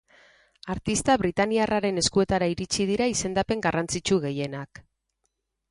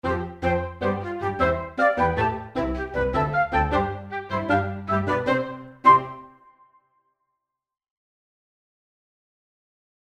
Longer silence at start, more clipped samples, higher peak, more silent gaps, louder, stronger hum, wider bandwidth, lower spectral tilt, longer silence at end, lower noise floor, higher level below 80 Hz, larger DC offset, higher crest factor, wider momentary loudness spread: first, 0.65 s vs 0.05 s; neither; second, -8 dBFS vs -4 dBFS; neither; about the same, -25 LUFS vs -23 LUFS; neither; first, 11.5 kHz vs 9.8 kHz; second, -4 dB/octave vs -7.5 dB/octave; second, 1.05 s vs 3.75 s; about the same, -78 dBFS vs -81 dBFS; second, -48 dBFS vs -42 dBFS; neither; about the same, 18 dB vs 22 dB; about the same, 10 LU vs 9 LU